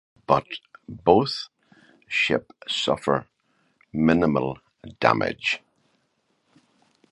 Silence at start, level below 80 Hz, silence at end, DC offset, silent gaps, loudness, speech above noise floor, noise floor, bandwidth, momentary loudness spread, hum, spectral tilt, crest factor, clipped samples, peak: 0.3 s; -54 dBFS; 1.55 s; under 0.1%; none; -23 LUFS; 48 dB; -71 dBFS; 11.5 kHz; 16 LU; none; -5.5 dB/octave; 24 dB; under 0.1%; -2 dBFS